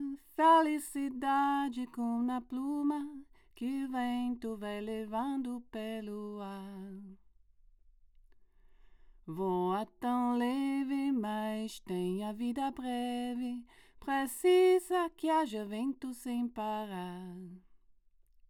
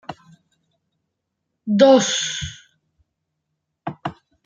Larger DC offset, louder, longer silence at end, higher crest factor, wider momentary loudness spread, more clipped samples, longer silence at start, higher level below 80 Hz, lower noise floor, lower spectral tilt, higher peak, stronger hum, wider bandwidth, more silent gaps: neither; second, -34 LUFS vs -17 LUFS; first, 0.75 s vs 0.35 s; about the same, 20 dB vs 20 dB; second, 16 LU vs 22 LU; neither; about the same, 0 s vs 0.1 s; second, -66 dBFS vs -56 dBFS; second, -65 dBFS vs -78 dBFS; first, -5.5 dB/octave vs -4 dB/octave; second, -14 dBFS vs -2 dBFS; neither; first, 18 kHz vs 9.4 kHz; neither